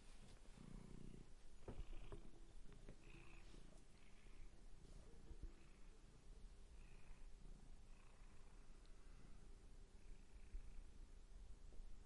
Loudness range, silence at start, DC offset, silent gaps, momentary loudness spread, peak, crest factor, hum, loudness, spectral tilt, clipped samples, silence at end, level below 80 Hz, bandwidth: 5 LU; 0 s; under 0.1%; none; 7 LU; -40 dBFS; 16 dB; none; -66 LUFS; -5.5 dB/octave; under 0.1%; 0 s; -60 dBFS; 11 kHz